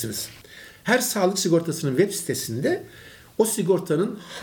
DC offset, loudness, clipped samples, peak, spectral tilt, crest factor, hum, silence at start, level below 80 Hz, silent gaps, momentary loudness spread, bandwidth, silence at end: under 0.1%; -23 LUFS; under 0.1%; -8 dBFS; -4.5 dB/octave; 18 dB; none; 0 s; -62 dBFS; none; 15 LU; 18 kHz; 0 s